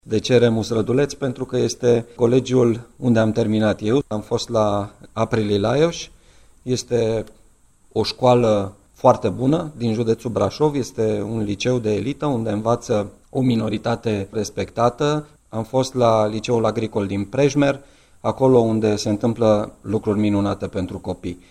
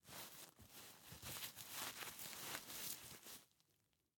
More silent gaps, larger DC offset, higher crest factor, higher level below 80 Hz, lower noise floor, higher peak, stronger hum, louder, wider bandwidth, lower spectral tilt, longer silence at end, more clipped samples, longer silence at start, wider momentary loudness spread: neither; neither; second, 20 dB vs 26 dB; first, -48 dBFS vs -78 dBFS; second, -53 dBFS vs -83 dBFS; first, 0 dBFS vs -28 dBFS; neither; first, -20 LUFS vs -51 LUFS; second, 12.5 kHz vs 17.5 kHz; first, -6.5 dB/octave vs -1 dB/octave; second, 0.15 s vs 0.7 s; neither; about the same, 0.05 s vs 0.05 s; about the same, 10 LU vs 11 LU